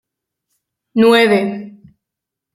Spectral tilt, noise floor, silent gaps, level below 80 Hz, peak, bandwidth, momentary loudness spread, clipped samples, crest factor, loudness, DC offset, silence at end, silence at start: -5.5 dB/octave; -82 dBFS; none; -64 dBFS; -2 dBFS; 14.5 kHz; 14 LU; under 0.1%; 16 dB; -13 LUFS; under 0.1%; 0.85 s; 0.95 s